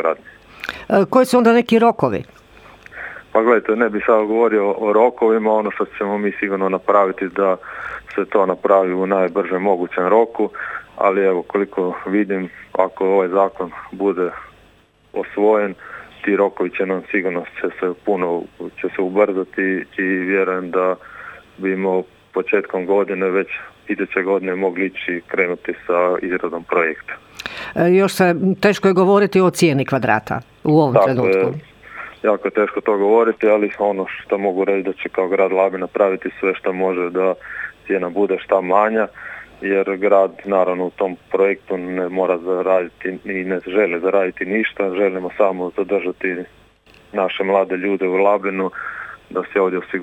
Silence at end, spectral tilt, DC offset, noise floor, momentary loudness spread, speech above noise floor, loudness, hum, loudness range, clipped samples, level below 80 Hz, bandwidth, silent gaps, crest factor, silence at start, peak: 0 s; -6.5 dB/octave; under 0.1%; -52 dBFS; 12 LU; 35 dB; -18 LUFS; none; 4 LU; under 0.1%; -58 dBFS; 16.5 kHz; none; 18 dB; 0 s; 0 dBFS